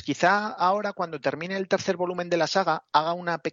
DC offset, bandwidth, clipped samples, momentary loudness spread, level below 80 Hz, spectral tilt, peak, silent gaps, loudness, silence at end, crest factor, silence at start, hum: under 0.1%; 7.8 kHz; under 0.1%; 7 LU; -74 dBFS; -4.5 dB/octave; -6 dBFS; none; -25 LUFS; 0 s; 20 dB; 0 s; none